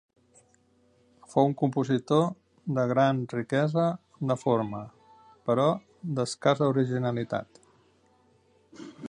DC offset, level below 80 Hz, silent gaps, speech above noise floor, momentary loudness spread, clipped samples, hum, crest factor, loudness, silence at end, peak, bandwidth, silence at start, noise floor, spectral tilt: under 0.1%; -68 dBFS; none; 39 dB; 11 LU; under 0.1%; none; 20 dB; -27 LUFS; 0 s; -8 dBFS; 10.5 kHz; 1.3 s; -65 dBFS; -7 dB/octave